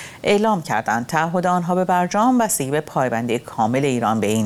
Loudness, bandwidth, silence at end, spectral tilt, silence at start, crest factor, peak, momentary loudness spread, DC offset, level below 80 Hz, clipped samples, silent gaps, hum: -19 LUFS; 17 kHz; 0 s; -5 dB/octave; 0 s; 16 dB; -2 dBFS; 4 LU; under 0.1%; -56 dBFS; under 0.1%; none; none